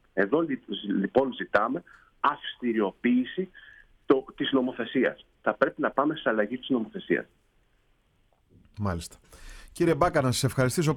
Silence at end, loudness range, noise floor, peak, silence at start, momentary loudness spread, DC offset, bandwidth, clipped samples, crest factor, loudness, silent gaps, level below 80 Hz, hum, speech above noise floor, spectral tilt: 0 s; 5 LU; -67 dBFS; -8 dBFS; 0.15 s; 8 LU; under 0.1%; 17.5 kHz; under 0.1%; 20 dB; -27 LUFS; none; -54 dBFS; none; 40 dB; -5.5 dB/octave